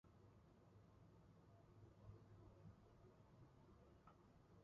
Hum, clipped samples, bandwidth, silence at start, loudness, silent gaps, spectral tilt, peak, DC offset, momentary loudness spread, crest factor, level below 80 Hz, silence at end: none; under 0.1%; 7 kHz; 0.05 s; -68 LUFS; none; -7.5 dB/octave; -50 dBFS; under 0.1%; 4 LU; 18 dB; -78 dBFS; 0 s